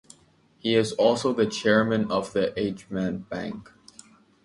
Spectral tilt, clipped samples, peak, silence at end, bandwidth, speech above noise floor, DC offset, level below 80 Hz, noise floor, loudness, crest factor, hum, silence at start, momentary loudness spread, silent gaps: -5 dB/octave; under 0.1%; -6 dBFS; 0.8 s; 11.5 kHz; 36 dB; under 0.1%; -58 dBFS; -60 dBFS; -25 LUFS; 20 dB; none; 0.65 s; 12 LU; none